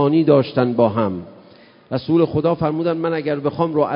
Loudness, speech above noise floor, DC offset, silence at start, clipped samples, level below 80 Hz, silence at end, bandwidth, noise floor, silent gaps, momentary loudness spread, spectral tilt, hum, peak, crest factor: -18 LUFS; 30 dB; under 0.1%; 0 s; under 0.1%; -50 dBFS; 0 s; 5.4 kHz; -47 dBFS; none; 9 LU; -12.5 dB/octave; none; -2 dBFS; 16 dB